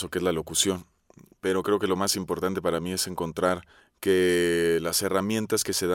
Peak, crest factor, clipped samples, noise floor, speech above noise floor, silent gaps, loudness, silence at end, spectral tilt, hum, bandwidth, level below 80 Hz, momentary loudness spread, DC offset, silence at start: -8 dBFS; 18 dB; under 0.1%; -56 dBFS; 30 dB; none; -26 LUFS; 0 s; -3.5 dB/octave; none; 17 kHz; -56 dBFS; 6 LU; under 0.1%; 0 s